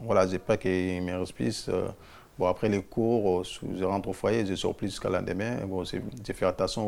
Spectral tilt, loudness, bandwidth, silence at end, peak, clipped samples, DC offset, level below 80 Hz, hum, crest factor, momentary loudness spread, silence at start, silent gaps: -6 dB/octave; -29 LUFS; 16 kHz; 0 s; -10 dBFS; under 0.1%; under 0.1%; -52 dBFS; none; 20 dB; 8 LU; 0 s; none